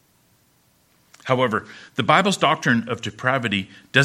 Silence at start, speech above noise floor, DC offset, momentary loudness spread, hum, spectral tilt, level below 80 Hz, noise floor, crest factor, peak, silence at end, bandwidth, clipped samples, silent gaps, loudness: 1.25 s; 40 dB; under 0.1%; 11 LU; none; -4.5 dB/octave; -64 dBFS; -61 dBFS; 22 dB; 0 dBFS; 0 s; 15.5 kHz; under 0.1%; none; -21 LUFS